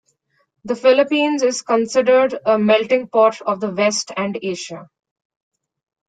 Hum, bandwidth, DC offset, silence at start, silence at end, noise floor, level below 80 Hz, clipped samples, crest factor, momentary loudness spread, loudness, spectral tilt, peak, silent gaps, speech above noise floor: none; 9.4 kHz; under 0.1%; 0.65 s; 1.25 s; -65 dBFS; -66 dBFS; under 0.1%; 16 dB; 11 LU; -17 LUFS; -4 dB/octave; -2 dBFS; none; 48 dB